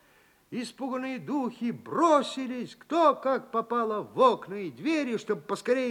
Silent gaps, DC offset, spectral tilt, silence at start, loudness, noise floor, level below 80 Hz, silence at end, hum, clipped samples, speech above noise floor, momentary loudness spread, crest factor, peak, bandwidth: none; under 0.1%; -5 dB/octave; 0.5 s; -28 LUFS; -62 dBFS; -76 dBFS; 0 s; none; under 0.1%; 34 dB; 12 LU; 20 dB; -8 dBFS; 16.5 kHz